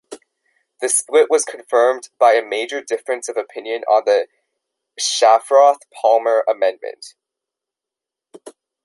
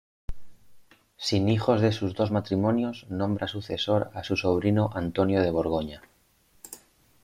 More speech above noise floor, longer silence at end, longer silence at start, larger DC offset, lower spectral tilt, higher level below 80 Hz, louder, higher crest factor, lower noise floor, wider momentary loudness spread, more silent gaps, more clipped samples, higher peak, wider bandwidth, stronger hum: first, 70 dB vs 38 dB; about the same, 0.35 s vs 0.45 s; second, 0.1 s vs 0.3 s; neither; second, 0.5 dB/octave vs -6.5 dB/octave; second, -78 dBFS vs -50 dBFS; first, -17 LUFS vs -26 LUFS; about the same, 16 dB vs 20 dB; first, -86 dBFS vs -63 dBFS; second, 13 LU vs 21 LU; neither; neither; first, -2 dBFS vs -8 dBFS; second, 12 kHz vs 15.5 kHz; neither